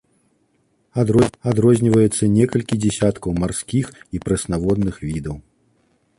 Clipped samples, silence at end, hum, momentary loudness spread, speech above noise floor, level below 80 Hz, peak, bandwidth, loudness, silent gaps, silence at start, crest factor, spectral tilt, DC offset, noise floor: under 0.1%; 0.8 s; none; 13 LU; 46 dB; -40 dBFS; -2 dBFS; 11.5 kHz; -19 LUFS; none; 0.95 s; 18 dB; -6.5 dB/octave; under 0.1%; -64 dBFS